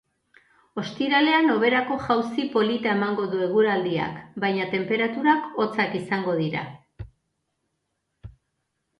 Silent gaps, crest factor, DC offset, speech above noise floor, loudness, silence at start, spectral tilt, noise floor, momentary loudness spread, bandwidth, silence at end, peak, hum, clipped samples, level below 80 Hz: none; 20 dB; under 0.1%; 54 dB; -23 LUFS; 0.75 s; -6.5 dB/octave; -77 dBFS; 14 LU; 11 kHz; 0.7 s; -6 dBFS; none; under 0.1%; -58 dBFS